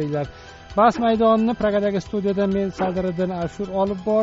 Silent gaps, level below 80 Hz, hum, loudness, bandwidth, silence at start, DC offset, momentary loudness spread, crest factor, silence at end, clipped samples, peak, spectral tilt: none; -46 dBFS; none; -21 LUFS; 7.8 kHz; 0 s; under 0.1%; 9 LU; 16 dB; 0 s; under 0.1%; -4 dBFS; -6 dB/octave